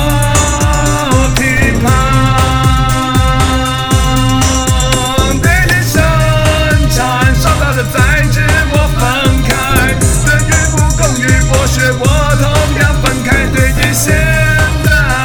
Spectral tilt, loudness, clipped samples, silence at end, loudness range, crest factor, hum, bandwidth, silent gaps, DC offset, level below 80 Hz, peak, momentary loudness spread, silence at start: -4.5 dB/octave; -10 LUFS; 0.2%; 0 s; 0 LU; 10 dB; none; over 20 kHz; none; under 0.1%; -16 dBFS; 0 dBFS; 2 LU; 0 s